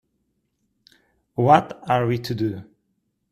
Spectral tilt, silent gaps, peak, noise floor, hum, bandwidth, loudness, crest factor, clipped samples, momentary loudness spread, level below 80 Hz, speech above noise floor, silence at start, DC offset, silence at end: -7.5 dB/octave; none; 0 dBFS; -73 dBFS; none; 14 kHz; -21 LUFS; 24 dB; under 0.1%; 14 LU; -60 dBFS; 53 dB; 1.4 s; under 0.1%; 0.7 s